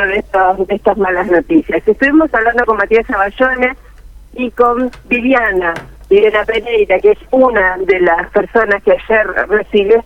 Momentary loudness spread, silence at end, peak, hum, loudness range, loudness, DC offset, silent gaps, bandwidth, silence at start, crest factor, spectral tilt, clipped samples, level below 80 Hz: 5 LU; 0.05 s; 0 dBFS; none; 2 LU; -12 LUFS; under 0.1%; none; 7 kHz; 0 s; 12 dB; -6.5 dB/octave; under 0.1%; -36 dBFS